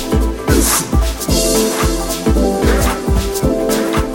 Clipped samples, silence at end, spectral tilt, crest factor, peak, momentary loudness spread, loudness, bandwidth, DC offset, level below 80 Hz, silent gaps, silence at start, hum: under 0.1%; 0 s; -4.5 dB/octave; 14 dB; 0 dBFS; 4 LU; -15 LUFS; 17 kHz; under 0.1%; -20 dBFS; none; 0 s; none